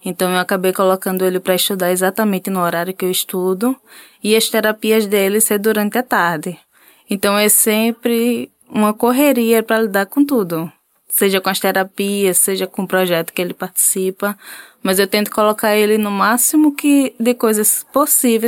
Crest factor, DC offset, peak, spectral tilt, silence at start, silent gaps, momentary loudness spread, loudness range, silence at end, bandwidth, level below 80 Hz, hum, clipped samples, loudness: 14 dB; under 0.1%; -2 dBFS; -3.5 dB/octave; 0.05 s; none; 8 LU; 3 LU; 0 s; 17 kHz; -64 dBFS; none; under 0.1%; -15 LUFS